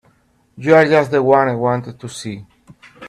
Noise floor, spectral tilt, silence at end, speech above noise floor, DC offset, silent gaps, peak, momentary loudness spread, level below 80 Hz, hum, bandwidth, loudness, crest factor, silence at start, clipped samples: -57 dBFS; -6.5 dB/octave; 0 s; 42 dB; under 0.1%; none; 0 dBFS; 19 LU; -56 dBFS; none; 12.5 kHz; -14 LUFS; 16 dB; 0.6 s; under 0.1%